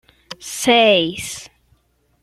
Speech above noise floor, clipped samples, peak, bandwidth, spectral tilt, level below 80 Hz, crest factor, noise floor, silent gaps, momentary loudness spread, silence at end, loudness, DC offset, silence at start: 44 dB; under 0.1%; -2 dBFS; 15 kHz; -2.5 dB/octave; -56 dBFS; 18 dB; -60 dBFS; none; 21 LU; 0.75 s; -15 LUFS; under 0.1%; 0.3 s